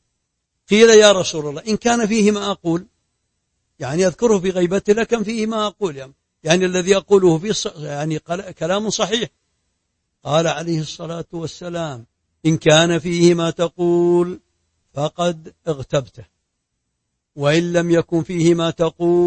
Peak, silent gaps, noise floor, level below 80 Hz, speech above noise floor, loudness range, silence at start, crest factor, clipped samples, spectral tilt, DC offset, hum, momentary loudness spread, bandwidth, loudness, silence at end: 0 dBFS; none; -75 dBFS; -52 dBFS; 57 dB; 7 LU; 0.7 s; 18 dB; under 0.1%; -4.5 dB/octave; under 0.1%; none; 14 LU; 8.8 kHz; -18 LUFS; 0 s